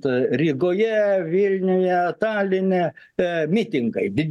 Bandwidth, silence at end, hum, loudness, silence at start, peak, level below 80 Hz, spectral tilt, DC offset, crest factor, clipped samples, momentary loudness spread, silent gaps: 9.6 kHz; 0 s; none; -21 LUFS; 0.05 s; -8 dBFS; -60 dBFS; -8 dB/octave; under 0.1%; 12 dB; under 0.1%; 4 LU; none